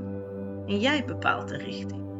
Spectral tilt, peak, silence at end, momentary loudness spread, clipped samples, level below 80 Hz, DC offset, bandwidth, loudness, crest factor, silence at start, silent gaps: -5.5 dB/octave; -10 dBFS; 0 s; 11 LU; under 0.1%; -68 dBFS; under 0.1%; 8 kHz; -29 LUFS; 20 dB; 0 s; none